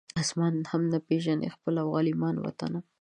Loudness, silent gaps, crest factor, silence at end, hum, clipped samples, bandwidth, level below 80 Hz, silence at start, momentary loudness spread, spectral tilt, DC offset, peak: -29 LUFS; none; 14 dB; 0.2 s; none; under 0.1%; 11 kHz; -66 dBFS; 0.15 s; 6 LU; -6 dB/octave; under 0.1%; -14 dBFS